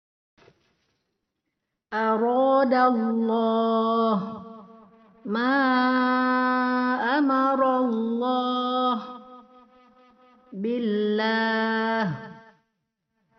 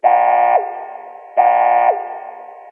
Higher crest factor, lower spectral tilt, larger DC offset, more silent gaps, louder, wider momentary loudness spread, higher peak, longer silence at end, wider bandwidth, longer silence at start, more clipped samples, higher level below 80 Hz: about the same, 18 dB vs 14 dB; about the same, -3.5 dB/octave vs -4.5 dB/octave; neither; neither; second, -23 LUFS vs -14 LUFS; second, 12 LU vs 20 LU; second, -8 dBFS vs -2 dBFS; first, 1 s vs 0 s; first, 6.2 kHz vs 3.3 kHz; first, 1.9 s vs 0 s; neither; first, -74 dBFS vs under -90 dBFS